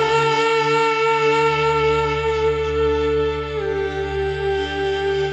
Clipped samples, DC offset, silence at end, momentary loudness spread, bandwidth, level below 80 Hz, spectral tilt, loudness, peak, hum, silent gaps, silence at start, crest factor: under 0.1%; under 0.1%; 0 s; 6 LU; 8.4 kHz; -36 dBFS; -5 dB/octave; -19 LUFS; -6 dBFS; none; none; 0 s; 12 dB